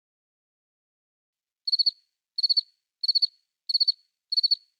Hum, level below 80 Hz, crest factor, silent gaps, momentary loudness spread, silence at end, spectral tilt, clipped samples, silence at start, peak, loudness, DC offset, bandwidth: none; under -90 dBFS; 16 dB; none; 12 LU; 0.25 s; 8.5 dB/octave; under 0.1%; 1.65 s; -14 dBFS; -24 LUFS; under 0.1%; 14 kHz